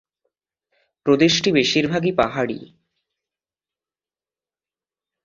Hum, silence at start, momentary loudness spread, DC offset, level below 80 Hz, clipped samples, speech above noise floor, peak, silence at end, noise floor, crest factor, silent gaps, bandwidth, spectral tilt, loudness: none; 1.05 s; 11 LU; under 0.1%; -56 dBFS; under 0.1%; over 71 dB; -2 dBFS; 2.6 s; under -90 dBFS; 22 dB; none; 7.6 kHz; -4.5 dB/octave; -19 LUFS